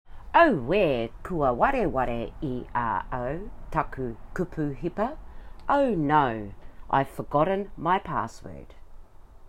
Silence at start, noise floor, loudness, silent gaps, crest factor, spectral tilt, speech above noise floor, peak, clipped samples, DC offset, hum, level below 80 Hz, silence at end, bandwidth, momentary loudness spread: 0.1 s; -46 dBFS; -26 LUFS; none; 22 dB; -7.5 dB/octave; 20 dB; -6 dBFS; under 0.1%; under 0.1%; none; -42 dBFS; 0 s; 16 kHz; 14 LU